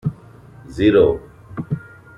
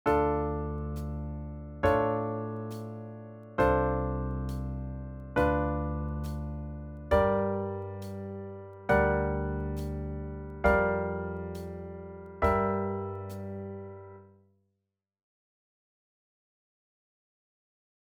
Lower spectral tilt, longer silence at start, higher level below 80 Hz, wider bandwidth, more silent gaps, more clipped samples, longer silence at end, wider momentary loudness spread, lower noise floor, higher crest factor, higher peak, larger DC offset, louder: about the same, -8.5 dB/octave vs -8.5 dB/octave; about the same, 0.05 s vs 0.05 s; about the same, -44 dBFS vs -42 dBFS; second, 10 kHz vs 16 kHz; neither; neither; second, 0.4 s vs 3.8 s; first, 20 LU vs 16 LU; second, -43 dBFS vs -85 dBFS; about the same, 18 dB vs 22 dB; first, -2 dBFS vs -10 dBFS; neither; first, -18 LUFS vs -31 LUFS